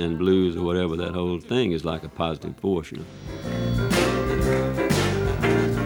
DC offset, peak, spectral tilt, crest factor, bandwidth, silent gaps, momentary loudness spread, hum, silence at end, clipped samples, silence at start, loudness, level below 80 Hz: under 0.1%; -8 dBFS; -6 dB/octave; 16 dB; 19 kHz; none; 8 LU; none; 0 s; under 0.1%; 0 s; -24 LUFS; -38 dBFS